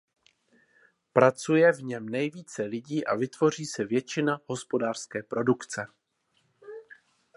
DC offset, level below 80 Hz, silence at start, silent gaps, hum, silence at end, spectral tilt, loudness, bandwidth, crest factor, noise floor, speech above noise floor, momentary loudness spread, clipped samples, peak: under 0.1%; -74 dBFS; 1.15 s; none; none; 0.55 s; -5.5 dB/octave; -28 LUFS; 11.5 kHz; 24 dB; -72 dBFS; 45 dB; 14 LU; under 0.1%; -4 dBFS